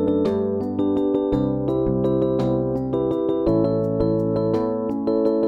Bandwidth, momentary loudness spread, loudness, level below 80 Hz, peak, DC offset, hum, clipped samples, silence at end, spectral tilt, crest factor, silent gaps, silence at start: 6 kHz; 3 LU; -22 LUFS; -42 dBFS; -8 dBFS; under 0.1%; none; under 0.1%; 0 s; -10.5 dB/octave; 12 dB; none; 0 s